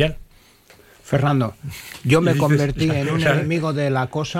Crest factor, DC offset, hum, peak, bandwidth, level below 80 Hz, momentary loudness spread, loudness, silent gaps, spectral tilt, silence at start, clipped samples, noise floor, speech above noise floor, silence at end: 16 dB; under 0.1%; none; -4 dBFS; 15.5 kHz; -42 dBFS; 9 LU; -20 LUFS; none; -6.5 dB/octave; 0 s; under 0.1%; -51 dBFS; 31 dB; 0 s